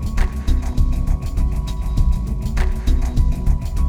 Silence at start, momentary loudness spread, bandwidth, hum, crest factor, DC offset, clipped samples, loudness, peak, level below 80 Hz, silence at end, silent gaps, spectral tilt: 0 s; 3 LU; 12.5 kHz; none; 12 dB; under 0.1%; under 0.1%; -22 LUFS; -6 dBFS; -18 dBFS; 0 s; none; -7 dB/octave